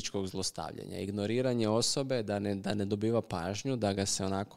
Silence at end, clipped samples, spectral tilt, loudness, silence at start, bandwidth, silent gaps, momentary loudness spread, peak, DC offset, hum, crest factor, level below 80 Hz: 0 s; under 0.1%; -4.5 dB/octave; -33 LUFS; 0 s; 16 kHz; none; 7 LU; -16 dBFS; 0.2%; none; 16 dB; -64 dBFS